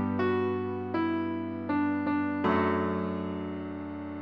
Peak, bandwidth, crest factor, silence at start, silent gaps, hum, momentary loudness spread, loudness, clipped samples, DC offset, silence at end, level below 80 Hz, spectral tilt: -14 dBFS; 5.6 kHz; 16 dB; 0 s; none; none; 10 LU; -30 LUFS; under 0.1%; 0.1%; 0 s; -64 dBFS; -9 dB/octave